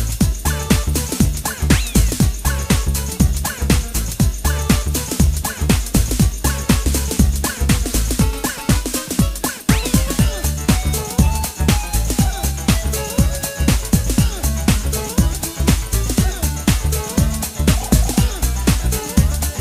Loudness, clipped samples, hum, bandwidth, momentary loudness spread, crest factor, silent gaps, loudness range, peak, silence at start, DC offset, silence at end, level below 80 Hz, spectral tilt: -18 LUFS; under 0.1%; none; 16.5 kHz; 4 LU; 16 dB; none; 1 LU; 0 dBFS; 0 s; under 0.1%; 0 s; -20 dBFS; -4.5 dB/octave